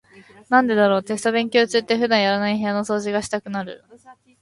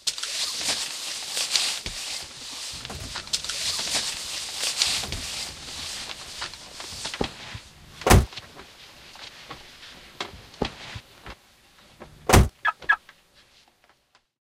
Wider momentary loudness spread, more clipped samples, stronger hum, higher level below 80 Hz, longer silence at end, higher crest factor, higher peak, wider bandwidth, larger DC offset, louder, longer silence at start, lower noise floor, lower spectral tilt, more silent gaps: second, 9 LU vs 22 LU; neither; neither; second, -62 dBFS vs -36 dBFS; second, 0.3 s vs 1.5 s; second, 18 dB vs 28 dB; second, -4 dBFS vs 0 dBFS; second, 11.5 kHz vs 16 kHz; neither; first, -20 LUFS vs -26 LUFS; about the same, 0.15 s vs 0.05 s; second, -48 dBFS vs -63 dBFS; first, -4.5 dB/octave vs -3 dB/octave; neither